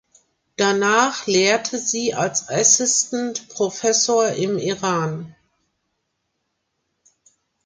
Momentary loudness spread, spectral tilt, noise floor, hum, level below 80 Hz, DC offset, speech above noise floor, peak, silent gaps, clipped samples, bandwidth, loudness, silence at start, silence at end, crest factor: 10 LU; -2.5 dB/octave; -74 dBFS; none; -66 dBFS; under 0.1%; 55 dB; -2 dBFS; none; under 0.1%; 10 kHz; -19 LUFS; 0.6 s; 2.35 s; 20 dB